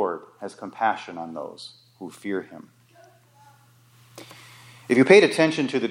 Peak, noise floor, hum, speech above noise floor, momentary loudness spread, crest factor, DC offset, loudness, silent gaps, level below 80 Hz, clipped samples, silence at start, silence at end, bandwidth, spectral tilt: -2 dBFS; -56 dBFS; none; 33 dB; 29 LU; 22 dB; under 0.1%; -21 LUFS; none; -74 dBFS; under 0.1%; 0 s; 0 s; 12.5 kHz; -5 dB/octave